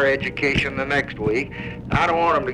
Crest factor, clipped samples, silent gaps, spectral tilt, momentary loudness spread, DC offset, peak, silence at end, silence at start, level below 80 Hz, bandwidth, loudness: 16 dB; under 0.1%; none; -6 dB/octave; 6 LU; under 0.1%; -6 dBFS; 0 s; 0 s; -40 dBFS; 11 kHz; -21 LUFS